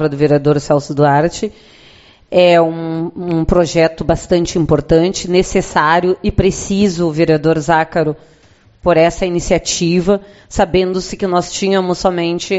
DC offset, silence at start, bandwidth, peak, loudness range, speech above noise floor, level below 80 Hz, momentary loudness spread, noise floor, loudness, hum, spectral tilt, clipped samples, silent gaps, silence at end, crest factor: under 0.1%; 0 s; 8.2 kHz; 0 dBFS; 2 LU; 30 dB; -32 dBFS; 7 LU; -44 dBFS; -14 LUFS; none; -5.5 dB/octave; under 0.1%; none; 0 s; 14 dB